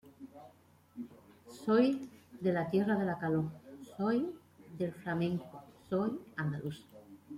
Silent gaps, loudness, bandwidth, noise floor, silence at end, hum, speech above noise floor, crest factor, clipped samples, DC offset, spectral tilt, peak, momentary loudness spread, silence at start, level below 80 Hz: none; -35 LUFS; 15.5 kHz; -63 dBFS; 0 s; none; 30 dB; 20 dB; under 0.1%; under 0.1%; -8 dB/octave; -16 dBFS; 22 LU; 0.05 s; -72 dBFS